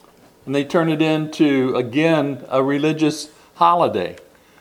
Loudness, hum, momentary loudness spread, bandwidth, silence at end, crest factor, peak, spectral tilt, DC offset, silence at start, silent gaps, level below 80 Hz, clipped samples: -18 LUFS; none; 8 LU; 13.5 kHz; 0.4 s; 18 dB; -2 dBFS; -6 dB/octave; under 0.1%; 0.45 s; none; -64 dBFS; under 0.1%